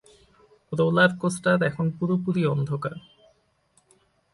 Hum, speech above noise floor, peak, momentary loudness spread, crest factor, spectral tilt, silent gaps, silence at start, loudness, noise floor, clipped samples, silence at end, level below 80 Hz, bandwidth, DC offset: none; 42 dB; -4 dBFS; 12 LU; 22 dB; -6.5 dB/octave; none; 0.7 s; -24 LUFS; -66 dBFS; under 0.1%; 1.35 s; -62 dBFS; 11.5 kHz; under 0.1%